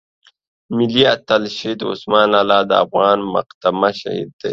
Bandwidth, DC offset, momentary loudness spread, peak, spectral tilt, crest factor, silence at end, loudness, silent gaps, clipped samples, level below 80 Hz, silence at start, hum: 7.8 kHz; under 0.1%; 10 LU; 0 dBFS; -5.5 dB/octave; 16 dB; 0 s; -16 LUFS; 3.54-3.61 s, 4.33-4.39 s; under 0.1%; -58 dBFS; 0.7 s; none